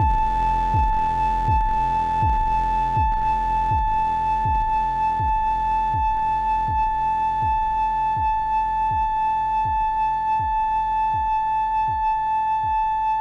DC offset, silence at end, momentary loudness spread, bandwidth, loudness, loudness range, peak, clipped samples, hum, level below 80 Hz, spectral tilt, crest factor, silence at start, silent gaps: under 0.1%; 0 s; 1 LU; 7.2 kHz; -21 LUFS; 1 LU; -10 dBFS; under 0.1%; none; -30 dBFS; -6.5 dB/octave; 10 dB; 0 s; none